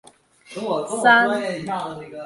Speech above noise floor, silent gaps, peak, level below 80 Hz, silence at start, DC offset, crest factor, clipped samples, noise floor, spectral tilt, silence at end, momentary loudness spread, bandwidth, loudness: 27 dB; none; -2 dBFS; -66 dBFS; 0.5 s; under 0.1%; 20 dB; under 0.1%; -48 dBFS; -3.5 dB/octave; 0 s; 17 LU; 11.5 kHz; -20 LUFS